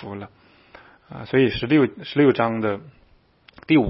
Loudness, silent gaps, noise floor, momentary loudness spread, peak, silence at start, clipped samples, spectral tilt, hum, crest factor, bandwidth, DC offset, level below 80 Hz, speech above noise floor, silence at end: -20 LUFS; none; -57 dBFS; 20 LU; -4 dBFS; 0 s; under 0.1%; -11 dB/octave; none; 18 dB; 5.8 kHz; under 0.1%; -52 dBFS; 36 dB; 0 s